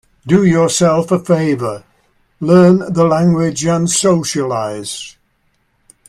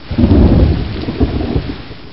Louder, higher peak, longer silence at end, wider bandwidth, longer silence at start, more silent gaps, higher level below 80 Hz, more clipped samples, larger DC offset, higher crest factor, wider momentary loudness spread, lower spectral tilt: about the same, -13 LUFS vs -13 LUFS; about the same, 0 dBFS vs 0 dBFS; first, 1 s vs 0 s; first, 13 kHz vs 5.8 kHz; first, 0.25 s vs 0 s; neither; second, -50 dBFS vs -18 dBFS; neither; second, under 0.1% vs 2%; about the same, 14 dB vs 12 dB; about the same, 14 LU vs 13 LU; second, -5.5 dB/octave vs -11.5 dB/octave